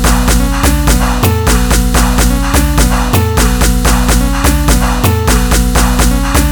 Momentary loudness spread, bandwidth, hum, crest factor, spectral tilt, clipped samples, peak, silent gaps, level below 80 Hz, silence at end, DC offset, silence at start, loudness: 1 LU; over 20 kHz; none; 8 dB; -4.5 dB/octave; 0.3%; 0 dBFS; none; -12 dBFS; 0 s; under 0.1%; 0 s; -11 LUFS